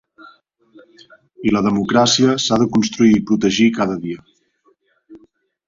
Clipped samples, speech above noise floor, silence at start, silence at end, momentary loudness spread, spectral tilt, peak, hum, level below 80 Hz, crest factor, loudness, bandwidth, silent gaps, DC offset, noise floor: under 0.1%; 45 dB; 0.25 s; 0.5 s; 10 LU; -4.5 dB/octave; -2 dBFS; none; -52 dBFS; 16 dB; -16 LUFS; 7.6 kHz; none; under 0.1%; -60 dBFS